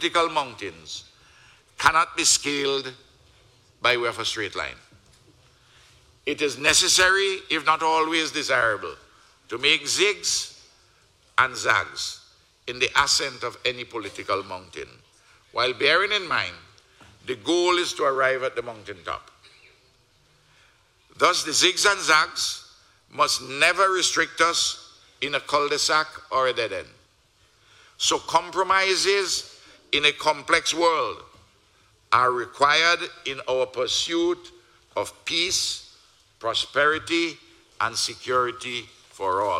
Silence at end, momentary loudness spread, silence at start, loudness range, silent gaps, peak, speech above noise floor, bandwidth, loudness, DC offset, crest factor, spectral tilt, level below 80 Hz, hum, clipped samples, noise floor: 0 s; 15 LU; 0 s; 5 LU; none; 0 dBFS; 38 dB; 16 kHz; -22 LUFS; under 0.1%; 24 dB; -1 dB/octave; -60 dBFS; none; under 0.1%; -61 dBFS